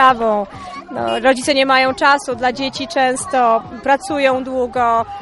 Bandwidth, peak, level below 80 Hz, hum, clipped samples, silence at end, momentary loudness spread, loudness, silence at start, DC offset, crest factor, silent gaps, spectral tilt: 11.5 kHz; 0 dBFS; -48 dBFS; none; under 0.1%; 0 s; 9 LU; -16 LUFS; 0 s; under 0.1%; 16 dB; none; -3 dB/octave